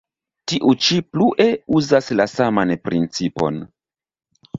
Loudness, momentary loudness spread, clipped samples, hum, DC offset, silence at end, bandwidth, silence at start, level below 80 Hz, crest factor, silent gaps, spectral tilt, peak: -18 LUFS; 8 LU; under 0.1%; none; under 0.1%; 0 s; 7.8 kHz; 0.45 s; -54 dBFS; 18 dB; none; -5 dB/octave; -2 dBFS